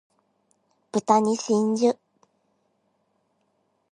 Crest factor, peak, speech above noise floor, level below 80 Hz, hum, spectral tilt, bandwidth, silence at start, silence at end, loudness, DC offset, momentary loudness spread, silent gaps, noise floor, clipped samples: 22 dB; -4 dBFS; 50 dB; -76 dBFS; none; -5.5 dB/octave; 11 kHz; 0.95 s; 2 s; -23 LUFS; under 0.1%; 9 LU; none; -71 dBFS; under 0.1%